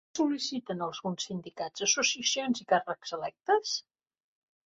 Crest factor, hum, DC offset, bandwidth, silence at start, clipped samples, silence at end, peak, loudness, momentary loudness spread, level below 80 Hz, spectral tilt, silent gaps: 20 dB; none; under 0.1%; 8.2 kHz; 0.15 s; under 0.1%; 0.85 s; -12 dBFS; -30 LUFS; 11 LU; -76 dBFS; -2 dB/octave; none